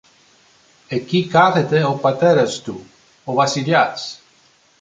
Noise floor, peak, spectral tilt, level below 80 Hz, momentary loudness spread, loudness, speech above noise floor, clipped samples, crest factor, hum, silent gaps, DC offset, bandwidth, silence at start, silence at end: -55 dBFS; -2 dBFS; -5.5 dB/octave; -62 dBFS; 16 LU; -17 LUFS; 38 dB; under 0.1%; 18 dB; none; none; under 0.1%; 9.4 kHz; 0.9 s; 0.65 s